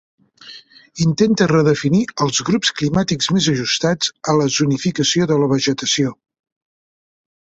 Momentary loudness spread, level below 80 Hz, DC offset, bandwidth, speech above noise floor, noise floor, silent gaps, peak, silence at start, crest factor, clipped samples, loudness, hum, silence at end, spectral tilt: 5 LU; -50 dBFS; under 0.1%; 8.2 kHz; 25 dB; -41 dBFS; none; -2 dBFS; 0.45 s; 16 dB; under 0.1%; -17 LUFS; none; 1.45 s; -4.5 dB/octave